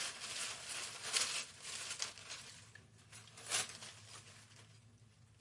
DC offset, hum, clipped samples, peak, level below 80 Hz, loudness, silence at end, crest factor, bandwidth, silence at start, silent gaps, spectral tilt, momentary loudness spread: under 0.1%; none; under 0.1%; -16 dBFS; -80 dBFS; -41 LUFS; 0 s; 30 dB; 11.5 kHz; 0 s; none; 0.5 dB/octave; 22 LU